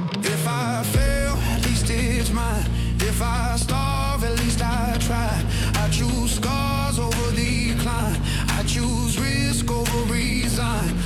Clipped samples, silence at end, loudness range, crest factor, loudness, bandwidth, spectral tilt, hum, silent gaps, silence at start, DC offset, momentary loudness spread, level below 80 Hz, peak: under 0.1%; 0 s; 0 LU; 14 dB; -22 LUFS; 16.5 kHz; -4.5 dB/octave; none; none; 0 s; under 0.1%; 2 LU; -26 dBFS; -8 dBFS